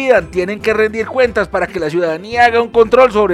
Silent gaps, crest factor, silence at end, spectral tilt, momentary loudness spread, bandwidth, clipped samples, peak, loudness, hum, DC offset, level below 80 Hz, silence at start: none; 12 dB; 0 s; -5.5 dB/octave; 8 LU; 12.5 kHz; 0.4%; 0 dBFS; -13 LUFS; none; under 0.1%; -40 dBFS; 0 s